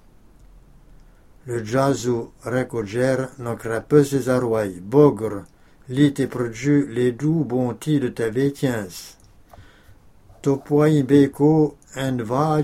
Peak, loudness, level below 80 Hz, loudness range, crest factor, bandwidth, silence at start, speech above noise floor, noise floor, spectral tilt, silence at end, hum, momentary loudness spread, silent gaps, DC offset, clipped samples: -2 dBFS; -21 LUFS; -52 dBFS; 5 LU; 20 dB; 15.5 kHz; 1.45 s; 29 dB; -49 dBFS; -7 dB/octave; 0 s; none; 12 LU; none; under 0.1%; under 0.1%